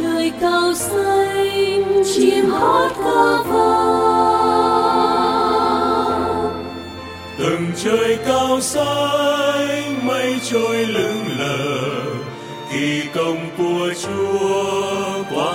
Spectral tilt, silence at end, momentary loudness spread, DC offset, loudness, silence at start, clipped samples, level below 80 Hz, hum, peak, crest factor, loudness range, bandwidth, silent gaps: -4 dB/octave; 0 s; 7 LU; under 0.1%; -17 LUFS; 0 s; under 0.1%; -50 dBFS; none; -2 dBFS; 16 dB; 6 LU; 16.5 kHz; none